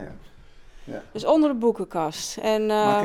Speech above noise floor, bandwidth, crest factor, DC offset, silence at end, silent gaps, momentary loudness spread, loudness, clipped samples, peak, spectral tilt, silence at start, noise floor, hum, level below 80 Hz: 24 dB; 16 kHz; 16 dB; under 0.1%; 0 s; none; 18 LU; -23 LUFS; under 0.1%; -8 dBFS; -4.5 dB/octave; 0 s; -46 dBFS; none; -52 dBFS